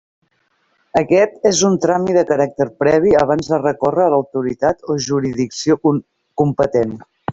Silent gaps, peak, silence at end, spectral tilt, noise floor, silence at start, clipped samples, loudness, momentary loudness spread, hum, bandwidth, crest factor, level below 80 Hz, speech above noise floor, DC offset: none; -2 dBFS; 0 s; -5.5 dB/octave; -63 dBFS; 0.95 s; under 0.1%; -16 LUFS; 7 LU; none; 8 kHz; 14 dB; -50 dBFS; 48 dB; under 0.1%